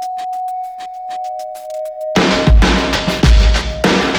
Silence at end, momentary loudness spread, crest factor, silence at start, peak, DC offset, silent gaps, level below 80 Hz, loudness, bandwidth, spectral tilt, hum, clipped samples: 0 s; 15 LU; 14 dB; 0 s; 0 dBFS; under 0.1%; none; -16 dBFS; -15 LUFS; 12.5 kHz; -5 dB/octave; none; under 0.1%